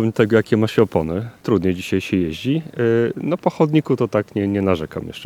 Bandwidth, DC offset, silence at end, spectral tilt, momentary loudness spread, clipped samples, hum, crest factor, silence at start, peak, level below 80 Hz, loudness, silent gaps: 16 kHz; under 0.1%; 0 s; -7.5 dB/octave; 6 LU; under 0.1%; none; 18 dB; 0 s; 0 dBFS; -48 dBFS; -19 LUFS; none